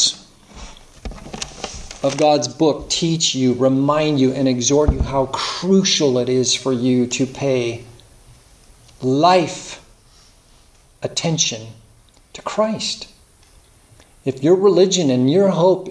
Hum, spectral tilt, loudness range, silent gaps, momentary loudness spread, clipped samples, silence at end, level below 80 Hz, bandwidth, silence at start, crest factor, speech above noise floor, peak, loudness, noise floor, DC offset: none; -4.5 dB/octave; 7 LU; none; 17 LU; under 0.1%; 0 s; -36 dBFS; 11 kHz; 0 s; 18 dB; 34 dB; -2 dBFS; -17 LUFS; -50 dBFS; under 0.1%